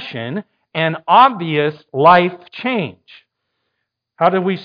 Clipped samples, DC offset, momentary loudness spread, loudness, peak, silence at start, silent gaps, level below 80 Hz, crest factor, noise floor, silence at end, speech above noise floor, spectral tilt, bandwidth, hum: under 0.1%; under 0.1%; 15 LU; -15 LUFS; 0 dBFS; 0 s; none; -64 dBFS; 16 dB; -75 dBFS; 0 s; 60 dB; -8 dB/octave; 5.2 kHz; none